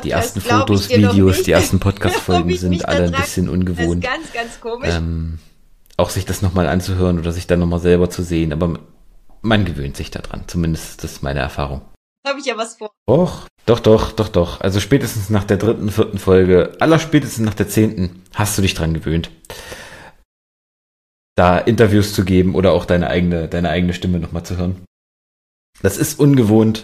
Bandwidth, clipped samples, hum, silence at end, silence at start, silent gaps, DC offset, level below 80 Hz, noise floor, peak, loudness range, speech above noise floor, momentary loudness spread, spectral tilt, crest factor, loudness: 15.5 kHz; under 0.1%; none; 0 s; 0 s; 11.96-12.23 s, 12.97-13.06 s, 13.50-13.57 s, 20.25-21.36 s, 24.87-25.73 s; under 0.1%; -34 dBFS; -42 dBFS; 0 dBFS; 6 LU; 26 dB; 13 LU; -6 dB/octave; 16 dB; -17 LUFS